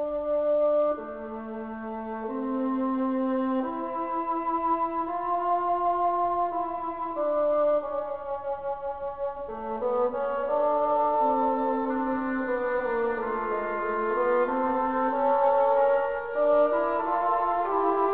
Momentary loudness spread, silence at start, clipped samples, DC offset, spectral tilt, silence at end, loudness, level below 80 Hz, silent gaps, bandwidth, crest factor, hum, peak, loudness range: 10 LU; 0 s; under 0.1%; 0.3%; -9.5 dB/octave; 0 s; -27 LUFS; -58 dBFS; none; 4 kHz; 14 dB; none; -12 dBFS; 5 LU